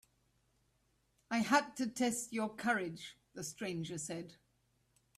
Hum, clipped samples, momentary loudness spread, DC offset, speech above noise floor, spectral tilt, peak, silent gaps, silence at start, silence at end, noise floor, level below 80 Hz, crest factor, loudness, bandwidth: none; under 0.1%; 14 LU; under 0.1%; 40 dB; -3.5 dB/octave; -18 dBFS; none; 1.3 s; 0.85 s; -77 dBFS; -76 dBFS; 22 dB; -37 LUFS; 15.5 kHz